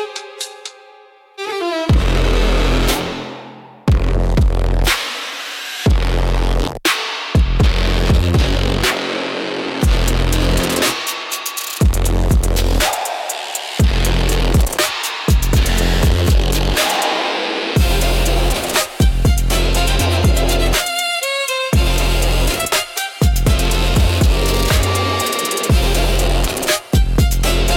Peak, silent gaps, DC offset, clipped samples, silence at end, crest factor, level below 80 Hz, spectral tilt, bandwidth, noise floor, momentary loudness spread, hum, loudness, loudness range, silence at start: -2 dBFS; none; under 0.1%; under 0.1%; 0 s; 14 dB; -18 dBFS; -4 dB/octave; 17 kHz; -45 dBFS; 7 LU; none; -17 LUFS; 2 LU; 0 s